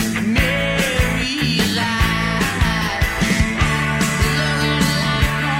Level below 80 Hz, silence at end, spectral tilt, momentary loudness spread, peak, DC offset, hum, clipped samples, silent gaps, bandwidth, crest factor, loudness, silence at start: -26 dBFS; 0 s; -4.5 dB/octave; 2 LU; -4 dBFS; under 0.1%; none; under 0.1%; none; 16.5 kHz; 14 dB; -17 LUFS; 0 s